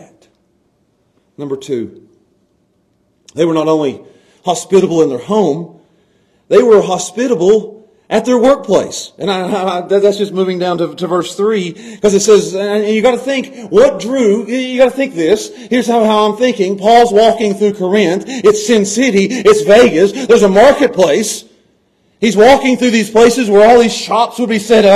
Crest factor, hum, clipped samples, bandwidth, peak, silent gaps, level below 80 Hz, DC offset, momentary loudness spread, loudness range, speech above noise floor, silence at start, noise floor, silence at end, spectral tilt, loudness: 12 dB; none; 0.2%; 13.5 kHz; 0 dBFS; none; -46 dBFS; under 0.1%; 11 LU; 6 LU; 48 dB; 1.4 s; -58 dBFS; 0 s; -4.5 dB/octave; -11 LUFS